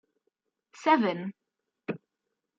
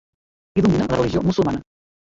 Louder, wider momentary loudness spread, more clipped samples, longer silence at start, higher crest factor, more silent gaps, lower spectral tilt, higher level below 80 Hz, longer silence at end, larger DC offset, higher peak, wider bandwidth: second, -28 LUFS vs -20 LUFS; first, 17 LU vs 7 LU; neither; first, 0.8 s vs 0.55 s; first, 22 dB vs 16 dB; neither; second, -6 dB/octave vs -7.5 dB/octave; second, -86 dBFS vs -42 dBFS; about the same, 0.6 s vs 0.55 s; neither; second, -10 dBFS vs -6 dBFS; about the same, 7.8 kHz vs 7.6 kHz